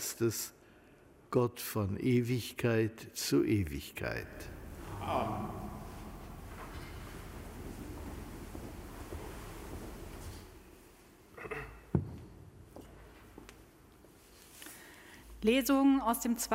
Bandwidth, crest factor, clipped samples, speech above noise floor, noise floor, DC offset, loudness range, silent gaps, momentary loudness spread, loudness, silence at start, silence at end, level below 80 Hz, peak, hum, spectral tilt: 16 kHz; 22 dB; under 0.1%; 28 dB; -60 dBFS; under 0.1%; 14 LU; none; 23 LU; -35 LUFS; 0 s; 0 s; -54 dBFS; -16 dBFS; none; -5.5 dB/octave